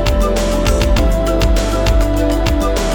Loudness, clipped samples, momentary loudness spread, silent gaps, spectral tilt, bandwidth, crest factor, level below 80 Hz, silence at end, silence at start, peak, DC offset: -15 LUFS; under 0.1%; 1 LU; none; -5.5 dB/octave; 18.5 kHz; 10 dB; -16 dBFS; 0 s; 0 s; -2 dBFS; under 0.1%